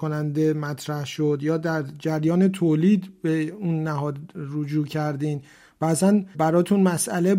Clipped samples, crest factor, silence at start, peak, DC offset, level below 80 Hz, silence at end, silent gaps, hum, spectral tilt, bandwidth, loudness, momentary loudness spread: under 0.1%; 14 dB; 0 s; -8 dBFS; under 0.1%; -66 dBFS; 0 s; none; none; -6.5 dB/octave; 16 kHz; -23 LUFS; 9 LU